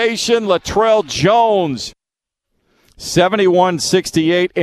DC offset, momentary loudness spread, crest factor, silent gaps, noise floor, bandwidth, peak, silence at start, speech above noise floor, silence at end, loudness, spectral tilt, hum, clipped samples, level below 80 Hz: under 0.1%; 8 LU; 16 dB; none; -83 dBFS; 14 kHz; 0 dBFS; 0 s; 69 dB; 0 s; -14 LUFS; -4.5 dB/octave; none; under 0.1%; -46 dBFS